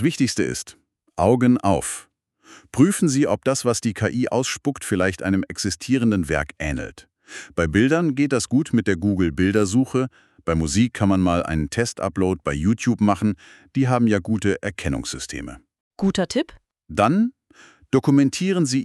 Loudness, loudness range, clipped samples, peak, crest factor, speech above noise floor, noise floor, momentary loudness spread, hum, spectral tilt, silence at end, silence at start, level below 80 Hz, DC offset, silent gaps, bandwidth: -21 LUFS; 3 LU; under 0.1%; -4 dBFS; 18 dB; 31 dB; -52 dBFS; 12 LU; none; -5.5 dB/octave; 0 s; 0 s; -42 dBFS; under 0.1%; 15.80-15.91 s; 13 kHz